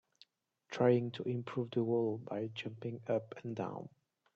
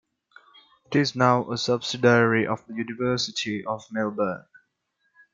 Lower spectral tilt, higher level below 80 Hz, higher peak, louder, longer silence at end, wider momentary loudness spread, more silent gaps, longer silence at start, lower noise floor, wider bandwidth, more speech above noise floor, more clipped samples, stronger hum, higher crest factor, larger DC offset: first, -8 dB/octave vs -5 dB/octave; second, -80 dBFS vs -66 dBFS; second, -16 dBFS vs -4 dBFS; second, -37 LUFS vs -24 LUFS; second, 0.45 s vs 0.95 s; about the same, 13 LU vs 11 LU; neither; second, 0.7 s vs 0.9 s; second, -68 dBFS vs -73 dBFS; about the same, 7.6 kHz vs 7.8 kHz; second, 32 dB vs 50 dB; neither; neither; about the same, 20 dB vs 22 dB; neither